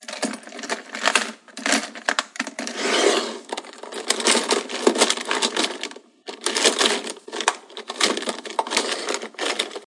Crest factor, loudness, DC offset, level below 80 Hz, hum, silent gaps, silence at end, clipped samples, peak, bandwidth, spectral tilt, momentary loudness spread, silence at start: 24 dB; -22 LUFS; under 0.1%; -84 dBFS; none; none; 0.05 s; under 0.1%; 0 dBFS; 11.5 kHz; 0 dB/octave; 14 LU; 0 s